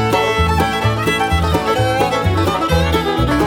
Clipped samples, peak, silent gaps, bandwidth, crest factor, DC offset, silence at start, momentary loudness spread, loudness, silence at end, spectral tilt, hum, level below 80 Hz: under 0.1%; -4 dBFS; none; 18 kHz; 10 dB; under 0.1%; 0 s; 1 LU; -16 LUFS; 0 s; -5.5 dB/octave; none; -28 dBFS